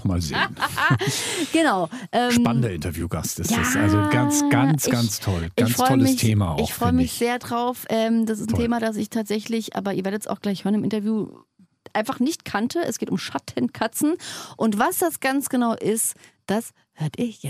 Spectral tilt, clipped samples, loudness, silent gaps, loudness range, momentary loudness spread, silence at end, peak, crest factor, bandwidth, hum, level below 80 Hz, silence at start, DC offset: -5 dB/octave; under 0.1%; -22 LUFS; none; 6 LU; 8 LU; 0 s; -4 dBFS; 18 dB; 16 kHz; none; -46 dBFS; 0 s; under 0.1%